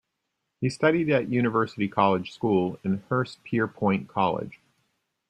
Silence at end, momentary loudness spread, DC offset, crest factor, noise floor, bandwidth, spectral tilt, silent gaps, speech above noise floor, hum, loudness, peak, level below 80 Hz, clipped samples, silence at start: 0.75 s; 7 LU; under 0.1%; 20 dB; -80 dBFS; 10 kHz; -7.5 dB/octave; none; 55 dB; none; -26 LUFS; -6 dBFS; -64 dBFS; under 0.1%; 0.6 s